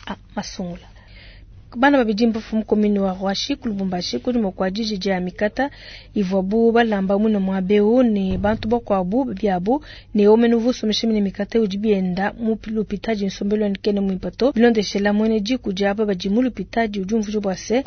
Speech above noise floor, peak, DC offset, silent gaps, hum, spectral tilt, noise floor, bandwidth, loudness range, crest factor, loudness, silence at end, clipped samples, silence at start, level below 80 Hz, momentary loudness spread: 23 dB; -4 dBFS; under 0.1%; none; none; -6 dB/octave; -42 dBFS; 6.6 kHz; 3 LU; 16 dB; -20 LUFS; 0 s; under 0.1%; 0.05 s; -44 dBFS; 8 LU